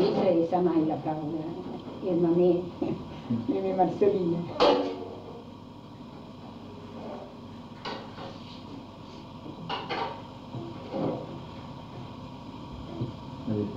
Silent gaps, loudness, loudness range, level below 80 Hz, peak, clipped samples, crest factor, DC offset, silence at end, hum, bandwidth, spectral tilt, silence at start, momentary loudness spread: none; -29 LUFS; 15 LU; -58 dBFS; -10 dBFS; under 0.1%; 20 dB; under 0.1%; 0 s; none; 7.6 kHz; -7.5 dB/octave; 0 s; 20 LU